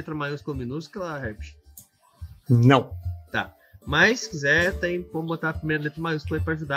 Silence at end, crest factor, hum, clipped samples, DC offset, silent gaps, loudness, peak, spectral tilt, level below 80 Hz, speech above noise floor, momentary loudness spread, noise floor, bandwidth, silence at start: 0 s; 22 dB; none; under 0.1%; under 0.1%; none; -24 LUFS; -2 dBFS; -6 dB/octave; -44 dBFS; 28 dB; 17 LU; -52 dBFS; 16 kHz; 0 s